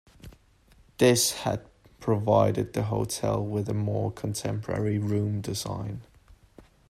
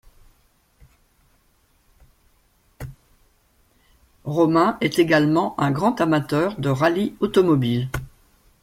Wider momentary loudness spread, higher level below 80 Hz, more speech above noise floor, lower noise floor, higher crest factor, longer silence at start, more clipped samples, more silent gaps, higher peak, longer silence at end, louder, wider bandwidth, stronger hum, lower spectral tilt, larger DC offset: second, 11 LU vs 18 LU; about the same, -54 dBFS vs -50 dBFS; second, 33 dB vs 42 dB; about the same, -59 dBFS vs -62 dBFS; about the same, 20 dB vs 18 dB; second, 0.25 s vs 2.8 s; neither; neither; second, -8 dBFS vs -4 dBFS; second, 0.3 s vs 0.55 s; second, -27 LUFS vs -20 LUFS; about the same, 16 kHz vs 16 kHz; neither; second, -5 dB/octave vs -7 dB/octave; neither